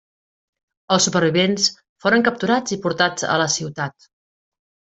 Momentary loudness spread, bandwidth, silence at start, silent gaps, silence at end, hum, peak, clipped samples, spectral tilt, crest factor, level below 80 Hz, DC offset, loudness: 7 LU; 8.4 kHz; 0.9 s; 1.89-1.96 s; 0.9 s; none; -2 dBFS; under 0.1%; -3.5 dB/octave; 18 dB; -62 dBFS; under 0.1%; -19 LUFS